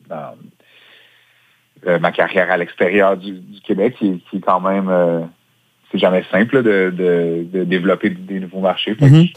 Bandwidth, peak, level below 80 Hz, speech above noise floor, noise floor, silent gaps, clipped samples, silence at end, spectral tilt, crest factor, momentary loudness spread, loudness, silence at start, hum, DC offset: 8.8 kHz; 0 dBFS; -58 dBFS; 43 dB; -58 dBFS; none; under 0.1%; 0.05 s; -8 dB/octave; 16 dB; 12 LU; -16 LUFS; 0.1 s; none; under 0.1%